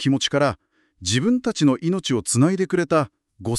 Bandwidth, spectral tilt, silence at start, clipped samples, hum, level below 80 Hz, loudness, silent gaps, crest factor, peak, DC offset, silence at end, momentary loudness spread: 13 kHz; -5 dB/octave; 0 s; under 0.1%; none; -54 dBFS; -21 LUFS; none; 16 dB; -6 dBFS; under 0.1%; 0 s; 10 LU